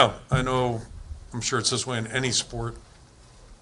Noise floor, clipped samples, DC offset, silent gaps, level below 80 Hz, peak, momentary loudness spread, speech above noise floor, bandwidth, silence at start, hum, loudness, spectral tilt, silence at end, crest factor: -51 dBFS; under 0.1%; under 0.1%; none; -44 dBFS; -2 dBFS; 15 LU; 26 dB; 11.5 kHz; 0 s; none; -26 LUFS; -3.5 dB/octave; 0.05 s; 26 dB